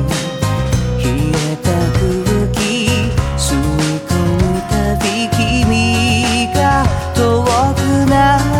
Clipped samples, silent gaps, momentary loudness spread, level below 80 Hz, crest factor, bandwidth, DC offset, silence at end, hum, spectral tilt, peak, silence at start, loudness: under 0.1%; none; 4 LU; -24 dBFS; 14 dB; 17 kHz; under 0.1%; 0 s; none; -5 dB/octave; 0 dBFS; 0 s; -14 LUFS